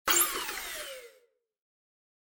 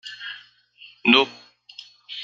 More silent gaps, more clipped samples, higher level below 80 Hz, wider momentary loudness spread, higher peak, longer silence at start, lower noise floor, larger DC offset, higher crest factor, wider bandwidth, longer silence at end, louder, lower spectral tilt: neither; neither; first, -64 dBFS vs -72 dBFS; second, 18 LU vs 26 LU; second, -12 dBFS vs -2 dBFS; about the same, 0.05 s vs 0.05 s; first, -67 dBFS vs -51 dBFS; neither; about the same, 24 dB vs 24 dB; first, 17 kHz vs 7.6 kHz; first, 1.3 s vs 0 s; second, -29 LUFS vs -19 LUFS; second, 1 dB/octave vs -4 dB/octave